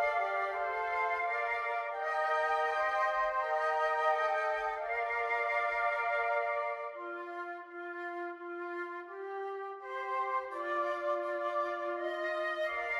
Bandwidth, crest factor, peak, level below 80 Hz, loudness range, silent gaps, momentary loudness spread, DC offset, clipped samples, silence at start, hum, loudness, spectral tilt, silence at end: 12 kHz; 16 dB; -18 dBFS; -70 dBFS; 8 LU; none; 10 LU; under 0.1%; under 0.1%; 0 s; none; -34 LUFS; -3 dB/octave; 0 s